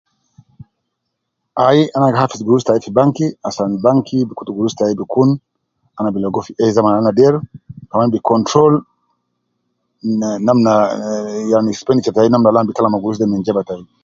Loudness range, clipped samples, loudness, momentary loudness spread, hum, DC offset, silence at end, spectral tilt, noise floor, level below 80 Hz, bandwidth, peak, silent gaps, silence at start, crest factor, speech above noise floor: 3 LU; under 0.1%; -15 LUFS; 9 LU; none; under 0.1%; 0.2 s; -7 dB/octave; -74 dBFS; -54 dBFS; 7.6 kHz; 0 dBFS; none; 1.55 s; 16 dB; 60 dB